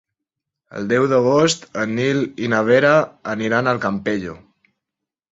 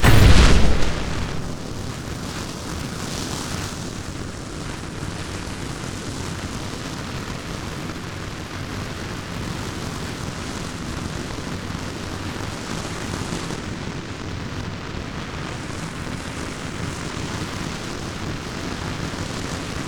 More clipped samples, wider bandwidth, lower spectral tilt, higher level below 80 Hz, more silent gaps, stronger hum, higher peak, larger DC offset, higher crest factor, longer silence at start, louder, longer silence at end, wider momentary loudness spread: neither; second, 8.2 kHz vs over 20 kHz; about the same, -5 dB/octave vs -5 dB/octave; second, -56 dBFS vs -30 dBFS; neither; neither; about the same, -2 dBFS vs 0 dBFS; neither; about the same, 18 dB vs 22 dB; first, 0.75 s vs 0 s; first, -18 LUFS vs -26 LUFS; first, 0.95 s vs 0 s; first, 11 LU vs 4 LU